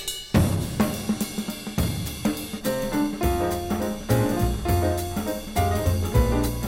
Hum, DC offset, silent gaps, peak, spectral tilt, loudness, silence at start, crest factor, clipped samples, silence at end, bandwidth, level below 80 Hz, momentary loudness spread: none; under 0.1%; none; -6 dBFS; -5.5 dB/octave; -25 LUFS; 0 s; 18 dB; under 0.1%; 0 s; 16.5 kHz; -32 dBFS; 6 LU